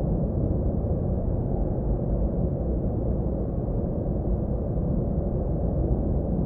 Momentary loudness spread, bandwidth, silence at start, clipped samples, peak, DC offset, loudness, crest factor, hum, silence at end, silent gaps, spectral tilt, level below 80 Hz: 2 LU; 1.9 kHz; 0 s; under 0.1%; -12 dBFS; under 0.1%; -27 LUFS; 14 dB; none; 0 s; none; -14.5 dB/octave; -30 dBFS